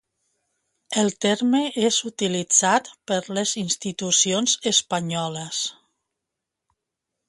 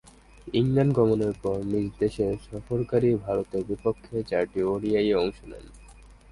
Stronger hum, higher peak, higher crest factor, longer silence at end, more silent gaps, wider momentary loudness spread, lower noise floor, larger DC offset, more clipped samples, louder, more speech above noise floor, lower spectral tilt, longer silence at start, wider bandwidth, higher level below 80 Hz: neither; first, -4 dBFS vs -8 dBFS; about the same, 22 dB vs 18 dB; first, 1.55 s vs 0.25 s; neither; about the same, 9 LU vs 9 LU; first, -84 dBFS vs -49 dBFS; neither; neither; first, -22 LUFS vs -26 LUFS; first, 61 dB vs 24 dB; second, -2.5 dB/octave vs -8 dB/octave; first, 0.9 s vs 0.45 s; about the same, 11.5 kHz vs 11.5 kHz; second, -68 dBFS vs -48 dBFS